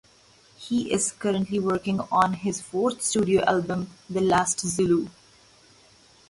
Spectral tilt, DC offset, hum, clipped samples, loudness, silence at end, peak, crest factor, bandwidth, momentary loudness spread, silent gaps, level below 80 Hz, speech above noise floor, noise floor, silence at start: -4.5 dB/octave; under 0.1%; none; under 0.1%; -25 LUFS; 1.2 s; -8 dBFS; 18 dB; 11.5 kHz; 8 LU; none; -58 dBFS; 32 dB; -57 dBFS; 0.6 s